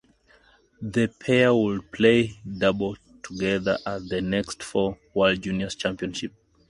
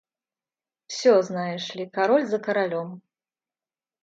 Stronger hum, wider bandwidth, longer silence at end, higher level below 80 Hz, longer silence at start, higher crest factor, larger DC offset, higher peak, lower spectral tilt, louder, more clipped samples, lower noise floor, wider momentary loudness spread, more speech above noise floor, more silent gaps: neither; first, 11.5 kHz vs 7.8 kHz; second, 0.4 s vs 1.05 s; first, -52 dBFS vs -80 dBFS; about the same, 0.8 s vs 0.9 s; about the same, 20 dB vs 18 dB; neither; first, -4 dBFS vs -8 dBFS; about the same, -5.5 dB/octave vs -5 dB/octave; about the same, -24 LUFS vs -24 LUFS; neither; second, -59 dBFS vs under -90 dBFS; about the same, 12 LU vs 12 LU; second, 35 dB vs over 67 dB; neither